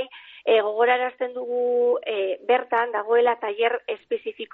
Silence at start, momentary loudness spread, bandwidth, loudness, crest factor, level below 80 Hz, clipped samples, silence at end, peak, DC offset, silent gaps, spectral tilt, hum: 0 s; 9 LU; 4.1 kHz; -23 LUFS; 16 dB; -78 dBFS; under 0.1%; 0.1 s; -8 dBFS; under 0.1%; none; 1 dB/octave; none